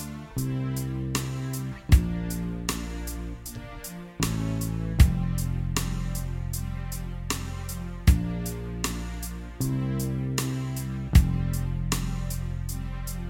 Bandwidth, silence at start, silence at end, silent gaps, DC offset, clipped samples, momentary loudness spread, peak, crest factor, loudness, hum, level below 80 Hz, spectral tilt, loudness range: 17 kHz; 0 s; 0 s; none; under 0.1%; under 0.1%; 12 LU; -4 dBFS; 22 dB; -29 LUFS; none; -32 dBFS; -5.5 dB/octave; 2 LU